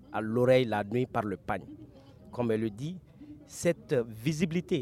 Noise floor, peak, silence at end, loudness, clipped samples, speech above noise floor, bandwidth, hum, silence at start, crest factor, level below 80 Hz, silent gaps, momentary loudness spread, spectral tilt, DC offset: -52 dBFS; -12 dBFS; 0 s; -30 LUFS; under 0.1%; 22 dB; 15.5 kHz; none; 0.1 s; 18 dB; -60 dBFS; none; 21 LU; -6.5 dB/octave; under 0.1%